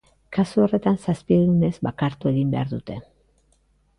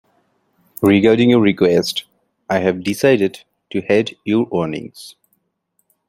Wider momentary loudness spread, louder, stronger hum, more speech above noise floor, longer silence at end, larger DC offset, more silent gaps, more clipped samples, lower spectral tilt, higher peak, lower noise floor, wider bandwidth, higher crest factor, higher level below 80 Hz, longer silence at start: second, 11 LU vs 14 LU; second, -22 LUFS vs -16 LUFS; neither; second, 42 dB vs 53 dB; about the same, 1 s vs 1 s; neither; neither; neither; first, -8.5 dB/octave vs -6 dB/octave; second, -6 dBFS vs -2 dBFS; second, -63 dBFS vs -68 dBFS; second, 11 kHz vs 16.5 kHz; about the same, 16 dB vs 16 dB; first, -50 dBFS vs -56 dBFS; second, 0.3 s vs 0.8 s